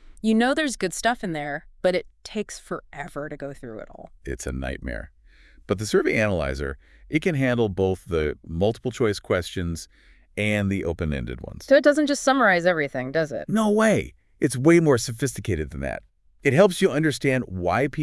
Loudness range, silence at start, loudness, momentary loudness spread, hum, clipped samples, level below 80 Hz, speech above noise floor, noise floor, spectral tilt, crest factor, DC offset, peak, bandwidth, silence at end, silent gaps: 10 LU; 0.1 s; -23 LUFS; 17 LU; none; under 0.1%; -44 dBFS; 28 dB; -52 dBFS; -5.5 dB/octave; 20 dB; under 0.1%; -2 dBFS; 12 kHz; 0 s; none